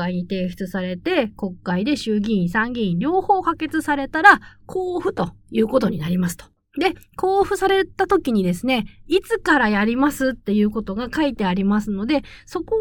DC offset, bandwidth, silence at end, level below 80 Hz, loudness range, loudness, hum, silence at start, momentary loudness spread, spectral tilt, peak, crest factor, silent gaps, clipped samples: under 0.1%; 18 kHz; 0 s; -46 dBFS; 3 LU; -20 LUFS; none; 0 s; 9 LU; -6 dB/octave; 0 dBFS; 20 dB; none; under 0.1%